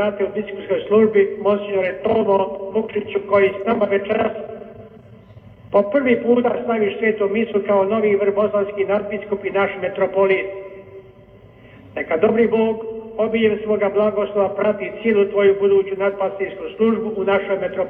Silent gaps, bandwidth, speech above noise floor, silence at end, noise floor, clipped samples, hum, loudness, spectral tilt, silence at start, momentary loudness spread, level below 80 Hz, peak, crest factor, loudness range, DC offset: none; 3.7 kHz; 27 dB; 0 s; -45 dBFS; under 0.1%; none; -19 LUFS; -9.5 dB/octave; 0 s; 8 LU; -56 dBFS; -2 dBFS; 16 dB; 3 LU; under 0.1%